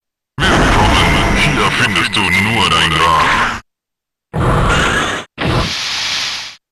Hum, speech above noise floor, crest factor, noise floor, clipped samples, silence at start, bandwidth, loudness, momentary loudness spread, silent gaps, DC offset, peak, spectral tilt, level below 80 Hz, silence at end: none; 68 dB; 10 dB; -80 dBFS; under 0.1%; 0.4 s; 12.5 kHz; -12 LUFS; 9 LU; none; under 0.1%; -4 dBFS; -4 dB/octave; -24 dBFS; 0.15 s